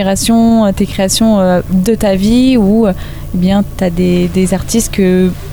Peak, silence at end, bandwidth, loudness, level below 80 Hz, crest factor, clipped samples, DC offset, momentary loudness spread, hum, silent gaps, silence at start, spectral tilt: 0 dBFS; 0 s; over 20 kHz; -11 LUFS; -26 dBFS; 10 dB; under 0.1%; under 0.1%; 5 LU; none; none; 0 s; -5.5 dB/octave